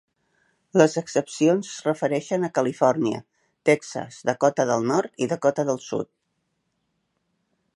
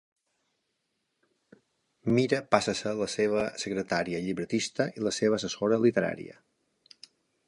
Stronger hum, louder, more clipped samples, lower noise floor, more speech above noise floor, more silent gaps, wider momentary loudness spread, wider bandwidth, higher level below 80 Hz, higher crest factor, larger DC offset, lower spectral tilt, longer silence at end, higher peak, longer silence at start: neither; first, -23 LUFS vs -28 LUFS; neither; second, -75 dBFS vs -79 dBFS; about the same, 52 dB vs 51 dB; neither; about the same, 8 LU vs 8 LU; about the same, 11.5 kHz vs 11.5 kHz; second, -72 dBFS vs -66 dBFS; about the same, 22 dB vs 26 dB; neither; about the same, -5.5 dB/octave vs -5 dB/octave; first, 1.7 s vs 1.15 s; about the same, -2 dBFS vs -4 dBFS; second, 0.75 s vs 2.05 s